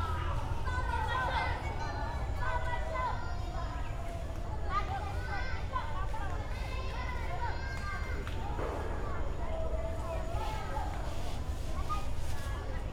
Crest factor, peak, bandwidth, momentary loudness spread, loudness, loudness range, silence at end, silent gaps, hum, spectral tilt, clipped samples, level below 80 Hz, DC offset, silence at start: 14 dB; -20 dBFS; 13.5 kHz; 5 LU; -37 LUFS; 3 LU; 0 s; none; none; -5.5 dB/octave; under 0.1%; -38 dBFS; under 0.1%; 0 s